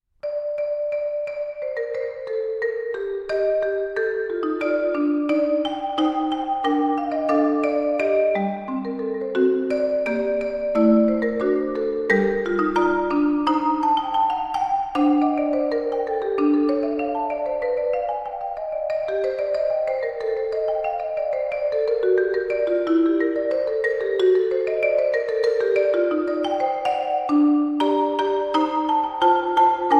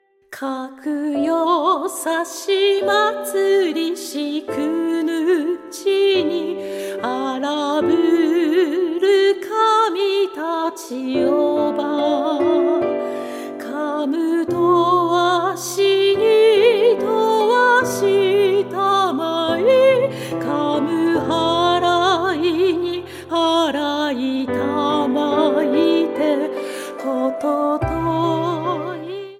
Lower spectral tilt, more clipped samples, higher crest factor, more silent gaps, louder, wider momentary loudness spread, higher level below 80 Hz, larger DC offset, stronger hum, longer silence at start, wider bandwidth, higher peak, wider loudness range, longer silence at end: first, -6.5 dB/octave vs -4.5 dB/octave; neither; about the same, 16 dB vs 16 dB; neither; second, -22 LUFS vs -18 LUFS; second, 7 LU vs 10 LU; about the same, -54 dBFS vs -52 dBFS; neither; neither; about the same, 0.25 s vs 0.3 s; second, 8.6 kHz vs 15.5 kHz; about the same, -4 dBFS vs -2 dBFS; about the same, 4 LU vs 4 LU; about the same, 0 s vs 0.05 s